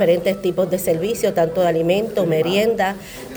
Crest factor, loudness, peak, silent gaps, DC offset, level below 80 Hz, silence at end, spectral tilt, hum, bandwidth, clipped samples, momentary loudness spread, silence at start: 14 dB; -19 LUFS; -4 dBFS; none; under 0.1%; -50 dBFS; 0 s; -5.5 dB/octave; none; over 20 kHz; under 0.1%; 3 LU; 0 s